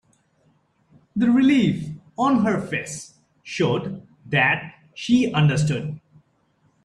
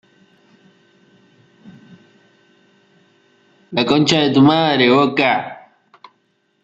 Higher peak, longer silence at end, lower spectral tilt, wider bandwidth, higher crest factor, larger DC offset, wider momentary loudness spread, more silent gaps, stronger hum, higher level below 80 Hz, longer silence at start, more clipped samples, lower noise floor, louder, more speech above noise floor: second, -6 dBFS vs 0 dBFS; second, 0.85 s vs 1.1 s; about the same, -6 dB/octave vs -5.5 dB/octave; first, 11 kHz vs 8 kHz; about the same, 18 dB vs 18 dB; neither; first, 17 LU vs 9 LU; neither; neither; about the same, -56 dBFS vs -60 dBFS; second, 1.15 s vs 1.65 s; neither; about the same, -64 dBFS vs -64 dBFS; second, -21 LUFS vs -14 LUFS; second, 44 dB vs 50 dB